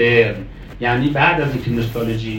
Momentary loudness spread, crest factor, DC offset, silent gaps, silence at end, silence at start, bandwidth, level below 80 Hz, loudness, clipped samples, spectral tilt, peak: 9 LU; 16 dB; under 0.1%; none; 0 s; 0 s; 16.5 kHz; -36 dBFS; -17 LUFS; under 0.1%; -7 dB/octave; 0 dBFS